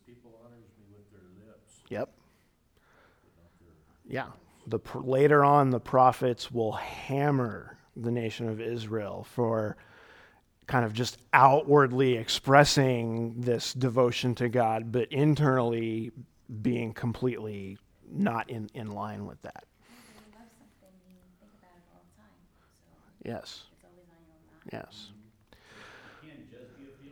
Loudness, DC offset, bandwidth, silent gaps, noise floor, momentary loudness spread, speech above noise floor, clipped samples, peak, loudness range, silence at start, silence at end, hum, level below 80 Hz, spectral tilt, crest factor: -27 LUFS; under 0.1%; 18.5 kHz; none; -67 dBFS; 22 LU; 40 dB; under 0.1%; -4 dBFS; 22 LU; 1.9 s; 0.05 s; none; -62 dBFS; -6 dB/octave; 26 dB